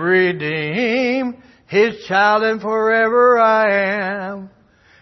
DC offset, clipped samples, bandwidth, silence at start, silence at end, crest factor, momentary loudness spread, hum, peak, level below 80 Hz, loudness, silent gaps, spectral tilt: under 0.1%; under 0.1%; 6.2 kHz; 0 s; 0.55 s; 14 dB; 10 LU; none; -4 dBFS; -62 dBFS; -16 LUFS; none; -6 dB/octave